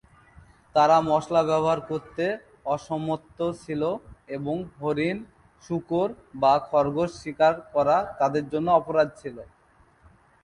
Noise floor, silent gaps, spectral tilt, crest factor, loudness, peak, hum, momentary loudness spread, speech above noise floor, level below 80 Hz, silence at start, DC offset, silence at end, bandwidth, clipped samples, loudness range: -59 dBFS; none; -6.5 dB/octave; 20 dB; -25 LUFS; -6 dBFS; none; 12 LU; 35 dB; -58 dBFS; 0.75 s; under 0.1%; 1 s; 11 kHz; under 0.1%; 6 LU